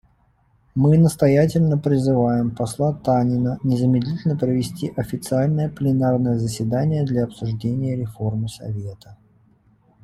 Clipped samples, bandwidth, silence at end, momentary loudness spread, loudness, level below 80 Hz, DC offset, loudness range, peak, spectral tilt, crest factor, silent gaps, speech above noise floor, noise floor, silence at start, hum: under 0.1%; 13 kHz; 0.9 s; 10 LU; -21 LUFS; -48 dBFS; under 0.1%; 6 LU; -4 dBFS; -8 dB/octave; 16 dB; none; 40 dB; -60 dBFS; 0.75 s; none